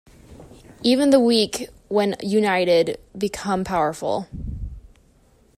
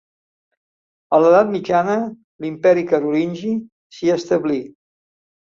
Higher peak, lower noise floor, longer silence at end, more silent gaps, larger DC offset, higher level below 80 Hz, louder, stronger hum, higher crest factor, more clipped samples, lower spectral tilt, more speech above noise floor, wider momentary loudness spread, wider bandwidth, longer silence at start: about the same, -4 dBFS vs -2 dBFS; second, -56 dBFS vs under -90 dBFS; about the same, 0.8 s vs 0.8 s; second, none vs 2.24-2.39 s, 3.72-3.90 s; neither; first, -42 dBFS vs -62 dBFS; second, -21 LUFS vs -18 LUFS; neither; about the same, 18 dB vs 18 dB; neither; second, -5 dB/octave vs -6.5 dB/octave; second, 36 dB vs over 73 dB; first, 17 LU vs 13 LU; first, 15 kHz vs 7.4 kHz; second, 0.3 s vs 1.1 s